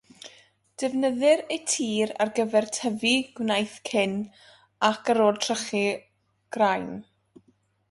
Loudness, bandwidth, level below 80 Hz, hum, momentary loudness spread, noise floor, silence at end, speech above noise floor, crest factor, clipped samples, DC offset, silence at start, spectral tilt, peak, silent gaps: -25 LUFS; 11.5 kHz; -70 dBFS; none; 15 LU; -66 dBFS; 0.9 s; 41 dB; 20 dB; under 0.1%; under 0.1%; 0.25 s; -3 dB/octave; -6 dBFS; none